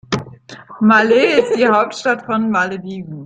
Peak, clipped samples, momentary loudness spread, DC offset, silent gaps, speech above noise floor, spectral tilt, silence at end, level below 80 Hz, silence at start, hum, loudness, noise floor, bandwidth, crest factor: -2 dBFS; under 0.1%; 14 LU; under 0.1%; none; 23 dB; -5.5 dB/octave; 0 s; -56 dBFS; 0.1 s; none; -15 LUFS; -37 dBFS; 9.2 kHz; 14 dB